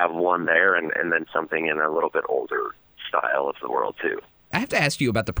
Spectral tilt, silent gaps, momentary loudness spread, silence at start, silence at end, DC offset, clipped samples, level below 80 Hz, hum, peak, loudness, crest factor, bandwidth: -5 dB/octave; none; 9 LU; 0 s; 0 s; under 0.1%; under 0.1%; -58 dBFS; none; -4 dBFS; -23 LUFS; 18 dB; over 20 kHz